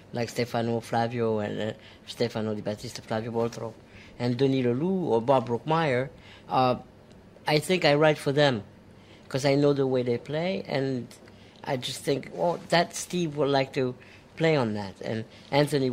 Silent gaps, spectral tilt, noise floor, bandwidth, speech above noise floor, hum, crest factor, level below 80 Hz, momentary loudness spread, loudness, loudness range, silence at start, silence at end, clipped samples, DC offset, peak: none; -5.5 dB/octave; -51 dBFS; 16 kHz; 25 dB; none; 22 dB; -62 dBFS; 12 LU; -27 LUFS; 5 LU; 0.1 s; 0 s; under 0.1%; under 0.1%; -6 dBFS